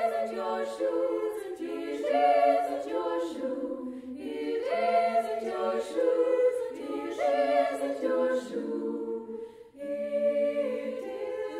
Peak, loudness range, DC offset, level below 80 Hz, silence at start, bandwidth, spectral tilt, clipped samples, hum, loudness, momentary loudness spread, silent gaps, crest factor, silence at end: -14 dBFS; 3 LU; under 0.1%; -72 dBFS; 0 s; 13 kHz; -4.5 dB/octave; under 0.1%; none; -29 LUFS; 11 LU; none; 16 dB; 0 s